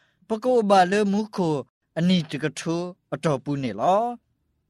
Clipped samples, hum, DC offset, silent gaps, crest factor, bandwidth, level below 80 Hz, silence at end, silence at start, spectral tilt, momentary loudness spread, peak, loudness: under 0.1%; none; under 0.1%; 1.70-1.81 s; 18 dB; 12 kHz; -64 dBFS; 0.55 s; 0.3 s; -6 dB/octave; 12 LU; -6 dBFS; -24 LUFS